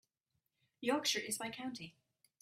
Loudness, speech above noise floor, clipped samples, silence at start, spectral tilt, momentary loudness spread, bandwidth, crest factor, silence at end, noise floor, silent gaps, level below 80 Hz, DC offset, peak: -38 LUFS; 47 dB; under 0.1%; 0.8 s; -2 dB/octave; 15 LU; 15.5 kHz; 20 dB; 0.5 s; -86 dBFS; none; -82 dBFS; under 0.1%; -22 dBFS